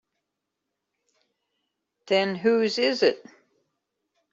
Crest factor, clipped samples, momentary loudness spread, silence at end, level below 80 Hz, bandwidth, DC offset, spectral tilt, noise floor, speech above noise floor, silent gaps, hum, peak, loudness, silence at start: 20 dB; under 0.1%; 3 LU; 1.15 s; -76 dBFS; 7.8 kHz; under 0.1%; -4.5 dB/octave; -83 dBFS; 60 dB; none; none; -8 dBFS; -23 LUFS; 2.05 s